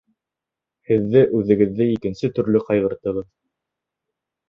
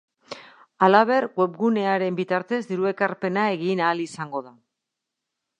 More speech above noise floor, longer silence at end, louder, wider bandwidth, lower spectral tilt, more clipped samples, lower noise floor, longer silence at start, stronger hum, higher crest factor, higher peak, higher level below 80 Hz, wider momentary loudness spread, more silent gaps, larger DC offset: first, 68 dB vs 61 dB; first, 1.25 s vs 1.1 s; first, -19 LUFS vs -23 LUFS; second, 6.8 kHz vs 10.5 kHz; first, -9 dB/octave vs -6.5 dB/octave; neither; about the same, -86 dBFS vs -83 dBFS; first, 0.9 s vs 0.3 s; neither; about the same, 18 dB vs 22 dB; about the same, -2 dBFS vs -2 dBFS; first, -52 dBFS vs -76 dBFS; second, 9 LU vs 16 LU; neither; neither